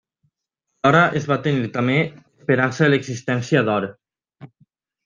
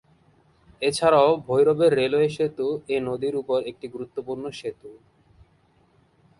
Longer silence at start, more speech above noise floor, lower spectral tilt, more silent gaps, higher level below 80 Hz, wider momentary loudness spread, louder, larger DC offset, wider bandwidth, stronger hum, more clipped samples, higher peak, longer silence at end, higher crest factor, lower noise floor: about the same, 0.85 s vs 0.8 s; first, 59 dB vs 39 dB; about the same, -6.5 dB/octave vs -5.5 dB/octave; neither; about the same, -60 dBFS vs -60 dBFS; second, 8 LU vs 15 LU; first, -19 LUFS vs -23 LUFS; neither; second, 7.6 kHz vs 11.5 kHz; neither; neither; first, -2 dBFS vs -6 dBFS; second, 0.6 s vs 1.45 s; about the same, 20 dB vs 20 dB; first, -78 dBFS vs -61 dBFS